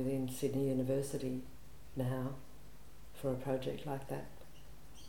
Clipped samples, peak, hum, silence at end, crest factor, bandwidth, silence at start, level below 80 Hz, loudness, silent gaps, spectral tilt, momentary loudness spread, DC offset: under 0.1%; -24 dBFS; none; 0 s; 16 dB; 19 kHz; 0 s; -60 dBFS; -39 LUFS; none; -7 dB/octave; 23 LU; 0.4%